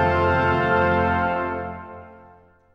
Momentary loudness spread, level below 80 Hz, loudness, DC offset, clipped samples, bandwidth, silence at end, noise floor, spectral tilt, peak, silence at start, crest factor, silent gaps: 18 LU; -42 dBFS; -21 LUFS; under 0.1%; under 0.1%; 7 kHz; 0.6 s; -52 dBFS; -8 dB/octave; -6 dBFS; 0 s; 16 dB; none